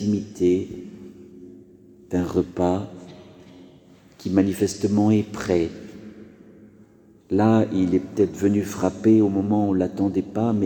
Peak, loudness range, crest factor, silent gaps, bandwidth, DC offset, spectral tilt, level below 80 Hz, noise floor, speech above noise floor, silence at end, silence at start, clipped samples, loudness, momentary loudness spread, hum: -4 dBFS; 7 LU; 18 dB; none; 19 kHz; under 0.1%; -7.5 dB/octave; -54 dBFS; -52 dBFS; 31 dB; 0 s; 0 s; under 0.1%; -22 LUFS; 21 LU; none